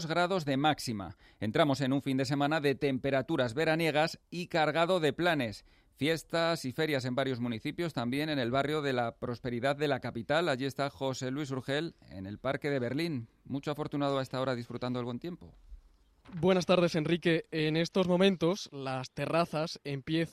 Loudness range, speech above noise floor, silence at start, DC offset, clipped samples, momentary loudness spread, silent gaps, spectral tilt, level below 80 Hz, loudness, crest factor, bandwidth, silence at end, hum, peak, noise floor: 5 LU; 30 dB; 0 s; under 0.1%; under 0.1%; 10 LU; none; -6 dB/octave; -62 dBFS; -32 LUFS; 18 dB; 15 kHz; 0 s; none; -14 dBFS; -62 dBFS